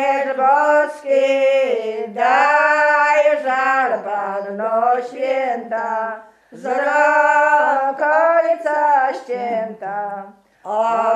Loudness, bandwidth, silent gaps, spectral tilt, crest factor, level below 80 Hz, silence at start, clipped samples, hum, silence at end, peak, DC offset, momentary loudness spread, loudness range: -17 LUFS; 10 kHz; none; -3.5 dB/octave; 16 dB; -76 dBFS; 0 s; under 0.1%; none; 0 s; -2 dBFS; under 0.1%; 11 LU; 4 LU